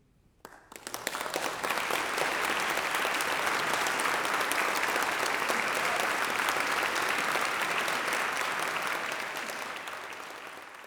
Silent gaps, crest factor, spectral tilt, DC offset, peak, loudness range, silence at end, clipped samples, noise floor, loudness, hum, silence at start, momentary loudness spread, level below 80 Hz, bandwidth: none; 22 dB; -1 dB/octave; under 0.1%; -10 dBFS; 3 LU; 0 s; under 0.1%; -55 dBFS; -29 LUFS; none; 0.45 s; 10 LU; -68 dBFS; over 20 kHz